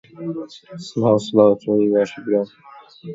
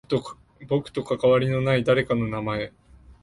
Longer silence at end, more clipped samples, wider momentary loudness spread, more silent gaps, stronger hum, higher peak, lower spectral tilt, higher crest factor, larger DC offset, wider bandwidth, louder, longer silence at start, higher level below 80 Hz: about the same, 0 s vs 0.1 s; neither; first, 18 LU vs 10 LU; neither; neither; first, 0 dBFS vs -8 dBFS; about the same, -7 dB/octave vs -7.5 dB/octave; about the same, 20 dB vs 16 dB; neither; second, 7.8 kHz vs 11.5 kHz; first, -18 LUFS vs -24 LUFS; about the same, 0.2 s vs 0.1 s; second, -62 dBFS vs -52 dBFS